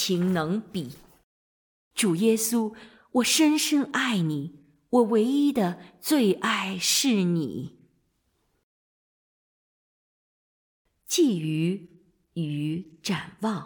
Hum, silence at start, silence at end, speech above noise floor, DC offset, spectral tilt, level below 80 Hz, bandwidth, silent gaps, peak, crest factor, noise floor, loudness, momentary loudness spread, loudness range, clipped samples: none; 0 s; 0 s; 48 dB; under 0.1%; -4 dB/octave; -68 dBFS; 19 kHz; 1.24-1.91 s, 8.63-10.85 s; -8 dBFS; 18 dB; -72 dBFS; -25 LUFS; 13 LU; 7 LU; under 0.1%